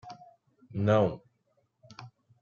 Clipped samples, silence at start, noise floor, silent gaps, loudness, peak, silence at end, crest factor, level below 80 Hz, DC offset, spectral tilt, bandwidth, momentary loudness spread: under 0.1%; 0.05 s; -74 dBFS; none; -28 LUFS; -12 dBFS; 0.35 s; 22 dB; -66 dBFS; under 0.1%; -8.5 dB/octave; 7 kHz; 25 LU